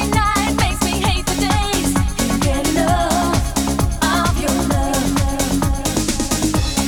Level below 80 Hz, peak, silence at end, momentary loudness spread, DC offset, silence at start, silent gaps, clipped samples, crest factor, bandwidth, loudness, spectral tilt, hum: -24 dBFS; -4 dBFS; 0 s; 2 LU; under 0.1%; 0 s; none; under 0.1%; 14 dB; 19.5 kHz; -18 LUFS; -4.5 dB/octave; none